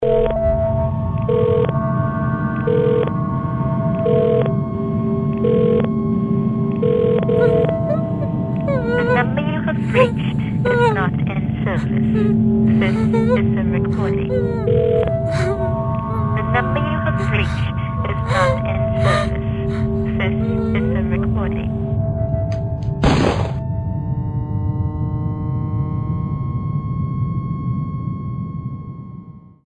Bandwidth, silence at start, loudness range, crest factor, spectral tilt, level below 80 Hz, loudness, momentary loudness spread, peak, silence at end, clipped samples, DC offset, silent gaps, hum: 10.5 kHz; 0 s; 5 LU; 16 dB; -8.5 dB/octave; -34 dBFS; -19 LUFS; 7 LU; -2 dBFS; 0.25 s; under 0.1%; under 0.1%; none; none